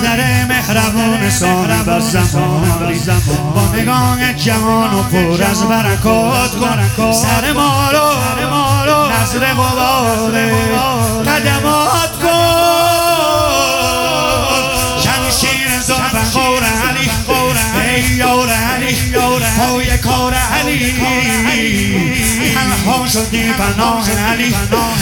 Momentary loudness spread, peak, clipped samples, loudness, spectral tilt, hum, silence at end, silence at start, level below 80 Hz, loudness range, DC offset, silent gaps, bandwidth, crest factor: 2 LU; 0 dBFS; under 0.1%; -12 LUFS; -4 dB/octave; none; 0 s; 0 s; -28 dBFS; 1 LU; under 0.1%; none; 18.5 kHz; 12 dB